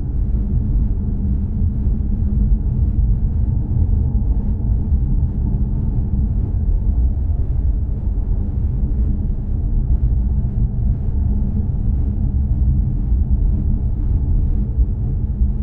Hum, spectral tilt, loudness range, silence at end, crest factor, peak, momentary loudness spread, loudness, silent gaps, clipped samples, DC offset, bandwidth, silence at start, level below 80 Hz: none; -13.5 dB/octave; 1 LU; 0 s; 12 dB; -4 dBFS; 3 LU; -20 LUFS; none; under 0.1%; under 0.1%; 1.6 kHz; 0 s; -18 dBFS